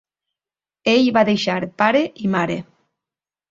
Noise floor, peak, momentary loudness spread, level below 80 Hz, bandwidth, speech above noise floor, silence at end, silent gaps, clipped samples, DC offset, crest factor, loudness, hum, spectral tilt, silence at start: under -90 dBFS; -2 dBFS; 9 LU; -60 dBFS; 7.6 kHz; over 72 dB; 0.9 s; none; under 0.1%; under 0.1%; 20 dB; -18 LUFS; none; -5.5 dB/octave; 0.85 s